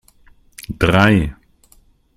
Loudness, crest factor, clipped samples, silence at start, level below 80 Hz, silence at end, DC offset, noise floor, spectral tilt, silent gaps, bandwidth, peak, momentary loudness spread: -15 LUFS; 18 dB; under 0.1%; 0.6 s; -36 dBFS; 0.85 s; under 0.1%; -53 dBFS; -6.5 dB/octave; none; 14.5 kHz; 0 dBFS; 20 LU